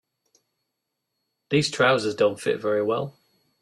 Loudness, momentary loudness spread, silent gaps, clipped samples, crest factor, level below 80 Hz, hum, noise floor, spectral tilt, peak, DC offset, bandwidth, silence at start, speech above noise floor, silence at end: -23 LUFS; 7 LU; none; under 0.1%; 20 dB; -64 dBFS; none; -81 dBFS; -4.5 dB/octave; -6 dBFS; under 0.1%; 12.5 kHz; 1.5 s; 58 dB; 0.5 s